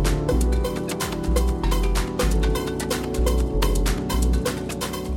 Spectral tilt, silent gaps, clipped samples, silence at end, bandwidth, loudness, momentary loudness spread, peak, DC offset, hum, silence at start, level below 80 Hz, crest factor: -5 dB/octave; none; under 0.1%; 0 s; 17 kHz; -24 LUFS; 4 LU; -8 dBFS; under 0.1%; none; 0 s; -24 dBFS; 14 dB